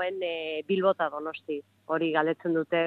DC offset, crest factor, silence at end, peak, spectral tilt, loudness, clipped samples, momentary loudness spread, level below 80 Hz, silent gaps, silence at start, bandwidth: under 0.1%; 18 dB; 0 s; -10 dBFS; -8 dB/octave; -29 LUFS; under 0.1%; 10 LU; -84 dBFS; none; 0 s; 4.5 kHz